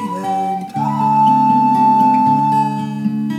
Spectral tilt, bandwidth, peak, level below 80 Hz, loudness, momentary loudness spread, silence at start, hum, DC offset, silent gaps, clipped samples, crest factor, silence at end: -7.5 dB/octave; 12.5 kHz; -2 dBFS; -68 dBFS; -14 LUFS; 9 LU; 0 s; none; under 0.1%; none; under 0.1%; 12 dB; 0 s